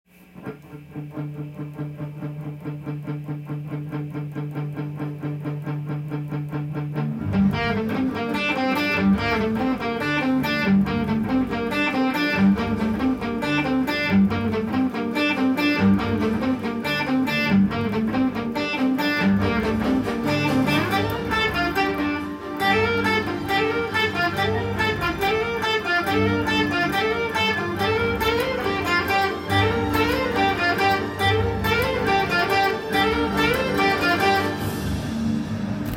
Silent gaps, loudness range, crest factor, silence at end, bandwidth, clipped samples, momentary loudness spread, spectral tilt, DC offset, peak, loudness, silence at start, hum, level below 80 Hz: none; 9 LU; 16 dB; 0 s; 16.5 kHz; under 0.1%; 11 LU; -6 dB/octave; under 0.1%; -6 dBFS; -22 LUFS; 0.35 s; none; -44 dBFS